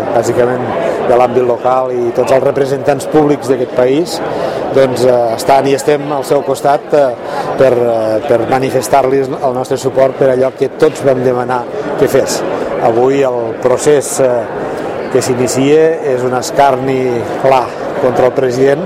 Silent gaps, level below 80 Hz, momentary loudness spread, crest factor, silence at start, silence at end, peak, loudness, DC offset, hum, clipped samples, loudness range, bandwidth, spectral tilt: none; -46 dBFS; 6 LU; 12 dB; 0 s; 0 s; 0 dBFS; -12 LUFS; under 0.1%; none; 0.3%; 1 LU; 16 kHz; -5.5 dB/octave